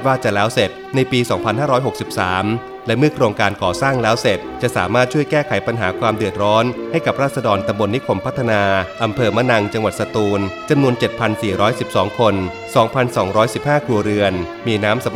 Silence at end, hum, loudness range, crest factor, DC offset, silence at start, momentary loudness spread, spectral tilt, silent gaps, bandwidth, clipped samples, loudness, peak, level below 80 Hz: 0 s; none; 1 LU; 16 dB; under 0.1%; 0 s; 4 LU; -5.5 dB/octave; none; 16 kHz; under 0.1%; -17 LUFS; 0 dBFS; -48 dBFS